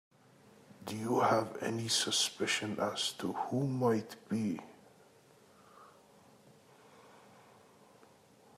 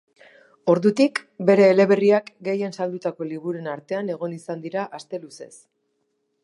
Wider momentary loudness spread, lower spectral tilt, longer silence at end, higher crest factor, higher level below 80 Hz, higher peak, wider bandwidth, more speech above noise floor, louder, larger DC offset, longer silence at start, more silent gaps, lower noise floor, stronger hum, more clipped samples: second, 11 LU vs 16 LU; second, -3.5 dB/octave vs -6.5 dB/octave; first, 1.4 s vs 1 s; about the same, 20 dB vs 18 dB; about the same, -80 dBFS vs -76 dBFS; second, -18 dBFS vs -4 dBFS; first, 15.5 kHz vs 11 kHz; second, 29 dB vs 51 dB; second, -34 LUFS vs -22 LUFS; neither; first, 0.8 s vs 0.65 s; neither; second, -63 dBFS vs -73 dBFS; neither; neither